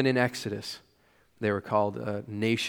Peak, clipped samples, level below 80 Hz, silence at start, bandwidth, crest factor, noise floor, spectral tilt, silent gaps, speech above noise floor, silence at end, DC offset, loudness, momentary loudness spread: -8 dBFS; under 0.1%; -68 dBFS; 0 s; 19.5 kHz; 20 dB; -65 dBFS; -5.5 dB/octave; none; 36 dB; 0 s; under 0.1%; -30 LUFS; 10 LU